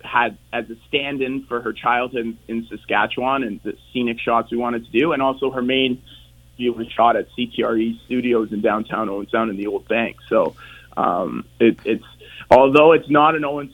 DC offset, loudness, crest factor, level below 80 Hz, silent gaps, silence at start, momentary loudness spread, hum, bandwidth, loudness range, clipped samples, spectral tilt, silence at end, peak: under 0.1%; -20 LUFS; 20 dB; -52 dBFS; none; 0.05 s; 13 LU; none; 17.5 kHz; 5 LU; under 0.1%; -6.5 dB/octave; 0.05 s; 0 dBFS